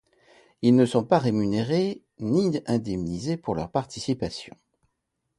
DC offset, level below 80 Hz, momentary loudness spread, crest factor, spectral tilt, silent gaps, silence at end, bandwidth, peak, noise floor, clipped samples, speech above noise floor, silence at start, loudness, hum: under 0.1%; -54 dBFS; 10 LU; 20 dB; -7 dB/octave; none; 0.9 s; 11.5 kHz; -6 dBFS; -79 dBFS; under 0.1%; 54 dB; 0.6 s; -25 LUFS; none